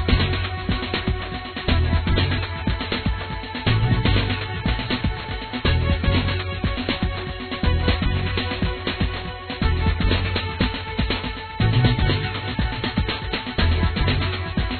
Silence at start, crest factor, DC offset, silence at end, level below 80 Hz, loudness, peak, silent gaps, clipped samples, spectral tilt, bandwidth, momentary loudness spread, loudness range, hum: 0 s; 16 dB; under 0.1%; 0 s; -28 dBFS; -23 LUFS; -6 dBFS; none; under 0.1%; -9 dB/octave; 4.6 kHz; 6 LU; 2 LU; none